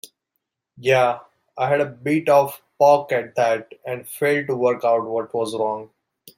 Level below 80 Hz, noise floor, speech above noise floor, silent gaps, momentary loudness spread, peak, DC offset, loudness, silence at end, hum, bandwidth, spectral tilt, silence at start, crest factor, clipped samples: -68 dBFS; -78 dBFS; 58 dB; none; 11 LU; -4 dBFS; under 0.1%; -20 LUFS; 0.55 s; none; 16 kHz; -5.5 dB/octave; 0.8 s; 18 dB; under 0.1%